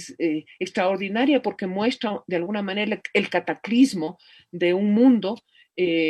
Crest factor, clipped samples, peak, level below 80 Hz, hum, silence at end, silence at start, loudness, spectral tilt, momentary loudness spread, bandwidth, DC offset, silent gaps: 16 dB; under 0.1%; -6 dBFS; -70 dBFS; none; 0 s; 0 s; -23 LUFS; -5.5 dB/octave; 12 LU; 12 kHz; under 0.1%; none